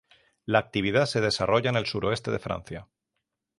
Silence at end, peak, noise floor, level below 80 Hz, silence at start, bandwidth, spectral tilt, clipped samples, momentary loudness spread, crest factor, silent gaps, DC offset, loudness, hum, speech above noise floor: 0.75 s; -6 dBFS; -82 dBFS; -54 dBFS; 0.5 s; 11.5 kHz; -5 dB/octave; under 0.1%; 14 LU; 22 dB; none; under 0.1%; -26 LUFS; none; 56 dB